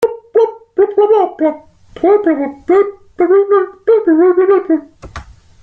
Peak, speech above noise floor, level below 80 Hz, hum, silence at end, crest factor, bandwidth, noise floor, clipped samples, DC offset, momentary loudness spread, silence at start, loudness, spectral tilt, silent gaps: -2 dBFS; 22 dB; -46 dBFS; none; 0.4 s; 12 dB; 6.4 kHz; -33 dBFS; under 0.1%; under 0.1%; 10 LU; 0 s; -13 LUFS; -7.5 dB/octave; none